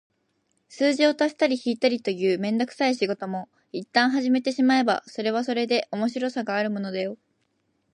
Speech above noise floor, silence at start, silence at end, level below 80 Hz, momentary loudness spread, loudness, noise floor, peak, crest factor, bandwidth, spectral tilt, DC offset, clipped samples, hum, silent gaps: 48 dB; 0.7 s; 0.8 s; -78 dBFS; 10 LU; -24 LUFS; -72 dBFS; -6 dBFS; 18 dB; 10.5 kHz; -5 dB/octave; under 0.1%; under 0.1%; none; none